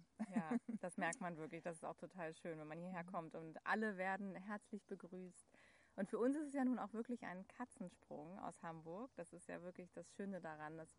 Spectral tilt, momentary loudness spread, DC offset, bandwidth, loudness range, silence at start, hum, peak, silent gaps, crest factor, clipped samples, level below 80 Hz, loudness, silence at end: -6 dB/octave; 13 LU; under 0.1%; 10.5 kHz; 7 LU; 0 s; none; -28 dBFS; none; 20 dB; under 0.1%; -86 dBFS; -48 LUFS; 0.05 s